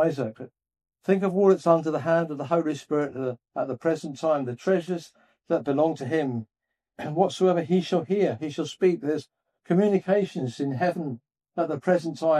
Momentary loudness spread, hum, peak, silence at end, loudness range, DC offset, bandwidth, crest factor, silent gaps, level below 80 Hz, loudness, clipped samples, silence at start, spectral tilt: 11 LU; none; -6 dBFS; 0 s; 3 LU; under 0.1%; 11 kHz; 20 dB; none; -76 dBFS; -26 LUFS; under 0.1%; 0 s; -7 dB/octave